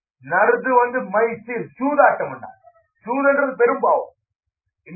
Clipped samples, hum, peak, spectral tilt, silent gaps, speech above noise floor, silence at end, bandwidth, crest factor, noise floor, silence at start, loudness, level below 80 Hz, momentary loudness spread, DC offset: under 0.1%; none; -2 dBFS; -13.5 dB/octave; none; 36 dB; 0 s; 2.7 kHz; 18 dB; -54 dBFS; 0.25 s; -19 LUFS; -70 dBFS; 13 LU; under 0.1%